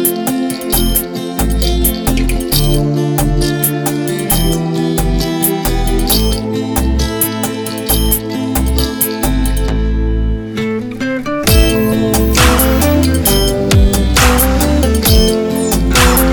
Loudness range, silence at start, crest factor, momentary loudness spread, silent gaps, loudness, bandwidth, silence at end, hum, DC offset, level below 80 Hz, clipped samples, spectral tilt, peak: 4 LU; 0 s; 12 dB; 7 LU; none; -13 LUFS; over 20 kHz; 0 s; none; 0.3%; -16 dBFS; under 0.1%; -4.5 dB/octave; 0 dBFS